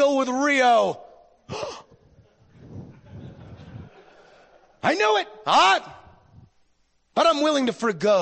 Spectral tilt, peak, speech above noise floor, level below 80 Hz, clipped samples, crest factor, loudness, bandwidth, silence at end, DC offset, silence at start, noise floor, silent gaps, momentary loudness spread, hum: -3.5 dB/octave; -8 dBFS; 45 dB; -62 dBFS; under 0.1%; 16 dB; -21 LUFS; 8.8 kHz; 0 s; under 0.1%; 0 s; -66 dBFS; none; 25 LU; none